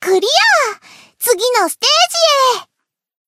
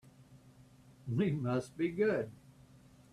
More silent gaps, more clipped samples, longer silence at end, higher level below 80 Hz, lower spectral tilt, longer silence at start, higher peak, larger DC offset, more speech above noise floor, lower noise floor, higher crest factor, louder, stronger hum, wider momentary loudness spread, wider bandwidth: neither; neither; about the same, 0.65 s vs 0.75 s; second, -78 dBFS vs -68 dBFS; second, 1 dB/octave vs -8 dB/octave; second, 0 s vs 0.2 s; first, 0 dBFS vs -20 dBFS; neither; first, 62 dB vs 27 dB; first, -75 dBFS vs -60 dBFS; about the same, 14 dB vs 16 dB; first, -12 LUFS vs -35 LUFS; neither; about the same, 10 LU vs 10 LU; first, 16 kHz vs 13 kHz